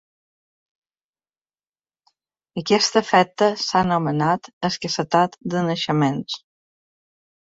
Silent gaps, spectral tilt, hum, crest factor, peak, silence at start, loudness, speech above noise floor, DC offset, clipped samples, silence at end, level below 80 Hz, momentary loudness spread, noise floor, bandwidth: 4.53-4.61 s; -4.5 dB/octave; none; 20 dB; -2 dBFS; 2.55 s; -20 LUFS; over 70 dB; under 0.1%; under 0.1%; 1.2 s; -60 dBFS; 11 LU; under -90 dBFS; 8 kHz